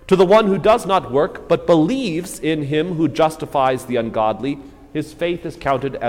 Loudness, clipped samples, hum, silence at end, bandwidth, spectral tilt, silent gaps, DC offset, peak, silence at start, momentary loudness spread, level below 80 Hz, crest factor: -18 LUFS; under 0.1%; none; 0 s; 16.5 kHz; -6 dB/octave; none; under 0.1%; -2 dBFS; 0.05 s; 11 LU; -46 dBFS; 14 dB